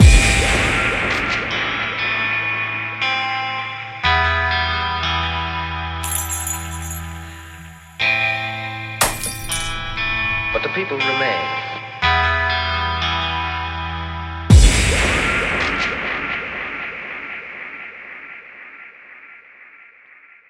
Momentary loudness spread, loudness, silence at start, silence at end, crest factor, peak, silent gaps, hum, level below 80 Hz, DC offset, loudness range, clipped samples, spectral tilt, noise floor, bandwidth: 17 LU; -19 LUFS; 0 s; 0.7 s; 20 dB; 0 dBFS; none; none; -26 dBFS; under 0.1%; 8 LU; under 0.1%; -3.5 dB/octave; -47 dBFS; 16 kHz